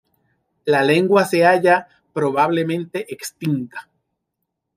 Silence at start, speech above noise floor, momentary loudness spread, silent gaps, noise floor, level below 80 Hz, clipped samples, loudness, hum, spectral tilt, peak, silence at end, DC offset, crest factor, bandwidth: 0.65 s; 60 dB; 15 LU; none; -78 dBFS; -68 dBFS; under 0.1%; -18 LUFS; none; -5.5 dB/octave; -4 dBFS; 0.95 s; under 0.1%; 16 dB; 16 kHz